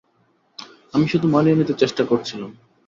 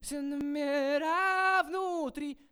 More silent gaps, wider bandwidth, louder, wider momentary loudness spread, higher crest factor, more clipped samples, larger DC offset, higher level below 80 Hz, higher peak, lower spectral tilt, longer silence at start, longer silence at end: neither; second, 7.4 kHz vs over 20 kHz; first, -19 LUFS vs -30 LUFS; first, 22 LU vs 9 LU; about the same, 18 dB vs 16 dB; neither; neither; about the same, -60 dBFS vs -62 dBFS; first, -4 dBFS vs -16 dBFS; first, -7 dB/octave vs -2.5 dB/octave; first, 0.6 s vs 0 s; first, 0.35 s vs 0.15 s